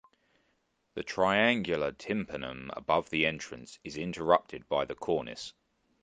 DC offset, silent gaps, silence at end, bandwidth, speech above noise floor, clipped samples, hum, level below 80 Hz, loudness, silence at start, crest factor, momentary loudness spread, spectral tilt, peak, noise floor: under 0.1%; none; 0.55 s; 9.6 kHz; 44 dB; under 0.1%; none; -60 dBFS; -31 LUFS; 0.95 s; 24 dB; 16 LU; -5 dB/octave; -8 dBFS; -75 dBFS